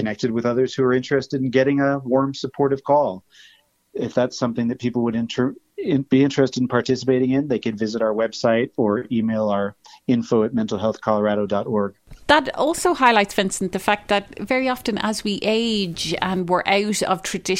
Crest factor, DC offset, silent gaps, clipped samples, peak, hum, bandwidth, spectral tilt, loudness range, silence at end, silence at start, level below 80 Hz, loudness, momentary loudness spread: 18 dB; under 0.1%; none; under 0.1%; -2 dBFS; none; 16 kHz; -5 dB/octave; 3 LU; 0 s; 0 s; -54 dBFS; -21 LUFS; 6 LU